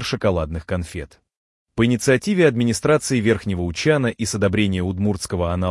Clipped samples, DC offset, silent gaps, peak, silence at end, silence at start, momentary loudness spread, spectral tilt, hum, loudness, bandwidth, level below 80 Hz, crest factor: under 0.1%; under 0.1%; 1.37-1.66 s; -4 dBFS; 0 s; 0 s; 10 LU; -5.5 dB/octave; none; -20 LUFS; 12 kHz; -44 dBFS; 16 dB